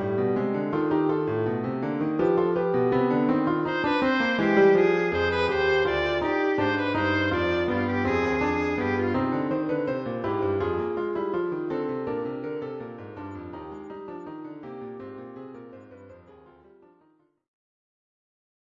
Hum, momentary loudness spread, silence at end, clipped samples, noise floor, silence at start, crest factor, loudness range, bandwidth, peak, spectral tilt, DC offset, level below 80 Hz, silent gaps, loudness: none; 16 LU; 2.55 s; under 0.1%; -64 dBFS; 0 s; 18 dB; 18 LU; 7.2 kHz; -8 dBFS; -7.5 dB/octave; under 0.1%; -56 dBFS; none; -25 LUFS